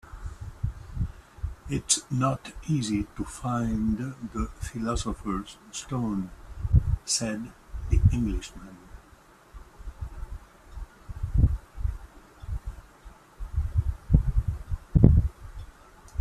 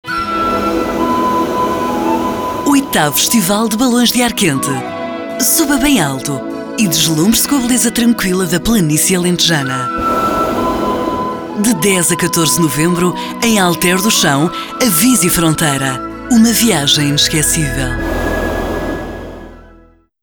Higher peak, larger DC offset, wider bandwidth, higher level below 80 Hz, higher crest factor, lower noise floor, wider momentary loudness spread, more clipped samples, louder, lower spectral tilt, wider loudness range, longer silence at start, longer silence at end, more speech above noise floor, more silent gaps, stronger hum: about the same, 0 dBFS vs 0 dBFS; neither; second, 13.5 kHz vs over 20 kHz; about the same, -32 dBFS vs -34 dBFS; first, 28 dB vs 12 dB; first, -55 dBFS vs -45 dBFS; first, 21 LU vs 8 LU; neither; second, -28 LUFS vs -13 LUFS; first, -5.5 dB/octave vs -3.5 dB/octave; first, 7 LU vs 2 LU; about the same, 0.1 s vs 0.05 s; second, 0 s vs 0.65 s; second, 26 dB vs 33 dB; neither; neither